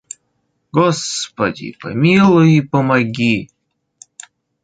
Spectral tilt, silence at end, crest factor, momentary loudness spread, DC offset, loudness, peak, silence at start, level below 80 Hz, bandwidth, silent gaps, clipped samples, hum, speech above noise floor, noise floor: -6 dB/octave; 1.2 s; 14 dB; 14 LU; under 0.1%; -15 LUFS; -2 dBFS; 0.75 s; -54 dBFS; 9.4 kHz; none; under 0.1%; none; 53 dB; -67 dBFS